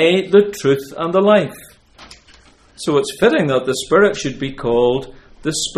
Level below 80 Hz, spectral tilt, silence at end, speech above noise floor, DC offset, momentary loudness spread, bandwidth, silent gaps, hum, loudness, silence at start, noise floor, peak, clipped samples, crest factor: -46 dBFS; -4.5 dB/octave; 0 s; 32 dB; under 0.1%; 11 LU; 14.5 kHz; none; none; -16 LUFS; 0 s; -48 dBFS; 0 dBFS; under 0.1%; 16 dB